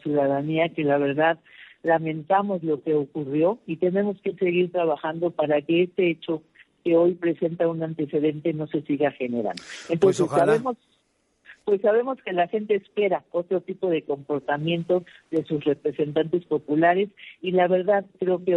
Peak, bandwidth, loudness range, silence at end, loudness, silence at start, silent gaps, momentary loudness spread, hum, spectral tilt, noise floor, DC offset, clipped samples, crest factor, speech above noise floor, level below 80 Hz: -6 dBFS; 11.5 kHz; 2 LU; 0 s; -24 LUFS; 0.05 s; none; 8 LU; none; -7 dB/octave; -69 dBFS; under 0.1%; under 0.1%; 18 dB; 46 dB; -70 dBFS